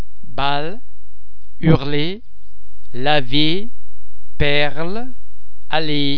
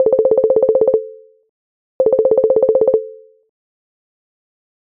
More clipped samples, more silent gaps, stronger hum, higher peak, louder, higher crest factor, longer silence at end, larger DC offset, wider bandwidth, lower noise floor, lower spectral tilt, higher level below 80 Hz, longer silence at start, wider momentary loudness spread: neither; second, none vs 1.49-1.99 s; neither; about the same, 0 dBFS vs -2 dBFS; second, -20 LUFS vs -14 LUFS; about the same, 18 dB vs 14 dB; second, 0 s vs 1.8 s; first, 30% vs under 0.1%; first, 5.4 kHz vs 2.3 kHz; first, -47 dBFS vs -34 dBFS; second, -7.5 dB/octave vs -11.5 dB/octave; first, -36 dBFS vs -56 dBFS; first, 0.25 s vs 0 s; first, 18 LU vs 7 LU